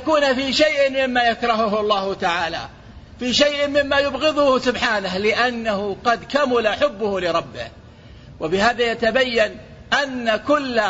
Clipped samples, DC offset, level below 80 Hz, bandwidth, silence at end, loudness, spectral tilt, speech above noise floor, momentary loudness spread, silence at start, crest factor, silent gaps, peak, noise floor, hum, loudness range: under 0.1%; under 0.1%; -46 dBFS; 8 kHz; 0 s; -19 LUFS; -3.5 dB/octave; 23 dB; 7 LU; 0 s; 16 dB; none; -4 dBFS; -42 dBFS; none; 2 LU